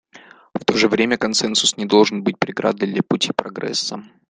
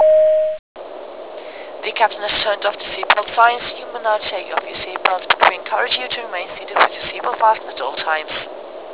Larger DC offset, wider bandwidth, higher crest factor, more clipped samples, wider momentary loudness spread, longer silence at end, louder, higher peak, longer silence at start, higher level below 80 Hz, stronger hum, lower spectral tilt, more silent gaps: second, under 0.1% vs 0.4%; first, 10 kHz vs 4 kHz; about the same, 20 dB vs 18 dB; neither; second, 8 LU vs 18 LU; first, 0.25 s vs 0 s; about the same, -19 LUFS vs -18 LUFS; about the same, 0 dBFS vs 0 dBFS; first, 0.15 s vs 0 s; about the same, -60 dBFS vs -56 dBFS; neither; second, -3.5 dB/octave vs -5.5 dB/octave; second, none vs 0.59-0.75 s